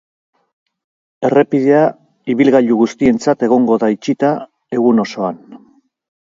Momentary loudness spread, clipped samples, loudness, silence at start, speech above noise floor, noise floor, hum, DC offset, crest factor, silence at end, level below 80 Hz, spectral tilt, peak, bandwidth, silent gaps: 11 LU; under 0.1%; -14 LUFS; 1.2 s; 38 dB; -51 dBFS; none; under 0.1%; 16 dB; 0.7 s; -56 dBFS; -7 dB/octave; 0 dBFS; 7.6 kHz; none